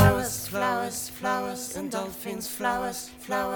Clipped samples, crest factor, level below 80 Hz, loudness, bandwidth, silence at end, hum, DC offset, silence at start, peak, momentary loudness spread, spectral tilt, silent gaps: under 0.1%; 20 dB; -46 dBFS; -29 LUFS; over 20 kHz; 0 s; none; under 0.1%; 0 s; -6 dBFS; 6 LU; -4.5 dB/octave; none